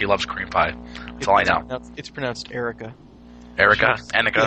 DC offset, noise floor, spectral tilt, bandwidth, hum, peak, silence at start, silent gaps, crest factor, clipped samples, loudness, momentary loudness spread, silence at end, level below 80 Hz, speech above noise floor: under 0.1%; -43 dBFS; -4 dB/octave; 8.8 kHz; 60 Hz at -45 dBFS; 0 dBFS; 0 s; none; 22 dB; under 0.1%; -20 LUFS; 19 LU; 0 s; -44 dBFS; 22 dB